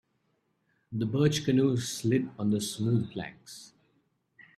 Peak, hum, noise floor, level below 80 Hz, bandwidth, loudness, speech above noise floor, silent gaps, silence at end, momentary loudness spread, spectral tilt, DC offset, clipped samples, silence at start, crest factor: -14 dBFS; none; -75 dBFS; -66 dBFS; 14.5 kHz; -29 LUFS; 46 dB; none; 0.15 s; 17 LU; -6 dB/octave; under 0.1%; under 0.1%; 0.9 s; 16 dB